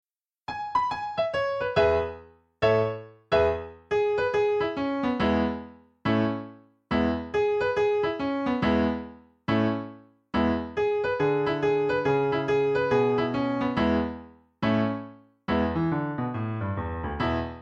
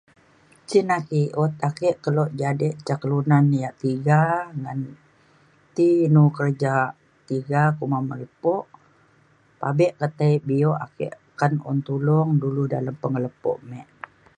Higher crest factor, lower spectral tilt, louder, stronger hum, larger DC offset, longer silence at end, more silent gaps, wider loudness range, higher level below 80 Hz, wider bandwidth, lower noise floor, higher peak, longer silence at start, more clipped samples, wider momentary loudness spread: about the same, 16 dB vs 20 dB; about the same, -7.5 dB/octave vs -8.5 dB/octave; second, -26 LUFS vs -22 LUFS; neither; neither; second, 0 s vs 0.55 s; neither; about the same, 3 LU vs 3 LU; first, -48 dBFS vs -66 dBFS; second, 7.6 kHz vs 10 kHz; second, -48 dBFS vs -58 dBFS; second, -10 dBFS vs -4 dBFS; second, 0.5 s vs 0.7 s; neither; about the same, 11 LU vs 13 LU